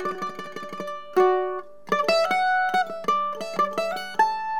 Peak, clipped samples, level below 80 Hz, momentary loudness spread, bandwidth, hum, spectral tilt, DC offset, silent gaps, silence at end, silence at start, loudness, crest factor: -6 dBFS; under 0.1%; -74 dBFS; 13 LU; 17 kHz; none; -4 dB/octave; 0.7%; none; 0 s; 0 s; -24 LUFS; 18 dB